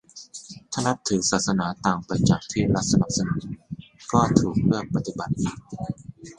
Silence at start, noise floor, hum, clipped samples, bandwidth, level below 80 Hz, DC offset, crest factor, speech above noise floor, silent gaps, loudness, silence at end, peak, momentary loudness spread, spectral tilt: 0.15 s; -43 dBFS; none; under 0.1%; 11 kHz; -46 dBFS; under 0.1%; 24 dB; 20 dB; none; -24 LUFS; 0.05 s; 0 dBFS; 17 LU; -5 dB/octave